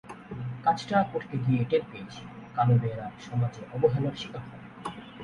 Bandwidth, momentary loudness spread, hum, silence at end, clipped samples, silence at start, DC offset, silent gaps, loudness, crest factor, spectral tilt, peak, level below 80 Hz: 10.5 kHz; 17 LU; none; 0 s; under 0.1%; 0.05 s; under 0.1%; none; -28 LUFS; 18 dB; -7.5 dB/octave; -10 dBFS; -60 dBFS